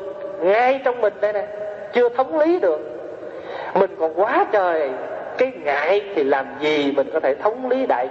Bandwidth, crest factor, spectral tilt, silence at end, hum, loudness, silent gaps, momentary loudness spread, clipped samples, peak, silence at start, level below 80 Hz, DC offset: 7.4 kHz; 18 dB; -2.5 dB/octave; 0 s; none; -20 LUFS; none; 12 LU; under 0.1%; -4 dBFS; 0 s; -66 dBFS; under 0.1%